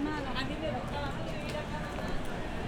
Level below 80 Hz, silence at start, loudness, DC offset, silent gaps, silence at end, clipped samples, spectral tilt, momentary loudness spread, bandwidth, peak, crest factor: -42 dBFS; 0 s; -36 LUFS; under 0.1%; none; 0 s; under 0.1%; -5.5 dB/octave; 3 LU; 16 kHz; -20 dBFS; 14 dB